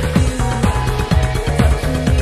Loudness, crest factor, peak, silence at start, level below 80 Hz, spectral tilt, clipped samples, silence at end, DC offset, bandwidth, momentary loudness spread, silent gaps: -17 LUFS; 14 dB; 0 dBFS; 0 s; -20 dBFS; -6 dB/octave; under 0.1%; 0 s; under 0.1%; 14.5 kHz; 2 LU; none